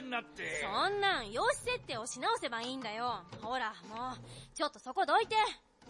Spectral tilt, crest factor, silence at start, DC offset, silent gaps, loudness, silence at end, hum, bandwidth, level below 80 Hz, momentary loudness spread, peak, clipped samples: -2.5 dB/octave; 18 dB; 0 s; under 0.1%; none; -35 LUFS; 0 s; none; 11.5 kHz; -64 dBFS; 11 LU; -18 dBFS; under 0.1%